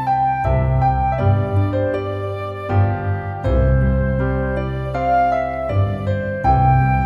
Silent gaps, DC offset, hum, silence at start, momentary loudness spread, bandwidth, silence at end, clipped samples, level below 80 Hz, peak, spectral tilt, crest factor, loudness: none; under 0.1%; none; 0 s; 7 LU; 5.4 kHz; 0 s; under 0.1%; -26 dBFS; -4 dBFS; -9.5 dB/octave; 14 dB; -19 LUFS